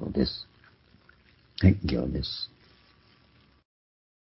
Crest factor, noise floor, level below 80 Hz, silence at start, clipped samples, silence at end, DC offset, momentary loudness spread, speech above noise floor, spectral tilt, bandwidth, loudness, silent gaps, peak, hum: 24 dB; -61 dBFS; -40 dBFS; 0 s; under 0.1%; 1.85 s; under 0.1%; 18 LU; 36 dB; -10.5 dB/octave; 5.8 kHz; -28 LUFS; none; -6 dBFS; none